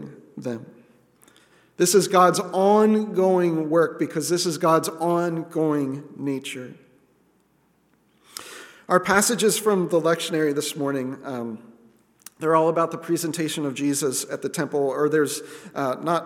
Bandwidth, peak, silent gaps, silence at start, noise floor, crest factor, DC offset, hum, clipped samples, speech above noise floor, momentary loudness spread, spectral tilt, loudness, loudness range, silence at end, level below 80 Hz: 17 kHz; -2 dBFS; none; 0 s; -64 dBFS; 20 dB; under 0.1%; none; under 0.1%; 42 dB; 17 LU; -4.5 dB/octave; -22 LUFS; 8 LU; 0 s; -70 dBFS